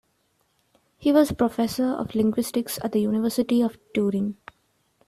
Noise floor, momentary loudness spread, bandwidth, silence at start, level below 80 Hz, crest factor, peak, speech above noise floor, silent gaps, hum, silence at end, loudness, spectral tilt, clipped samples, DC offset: -69 dBFS; 7 LU; 14.5 kHz; 1 s; -58 dBFS; 16 dB; -8 dBFS; 46 dB; none; none; 0.75 s; -24 LUFS; -6 dB/octave; under 0.1%; under 0.1%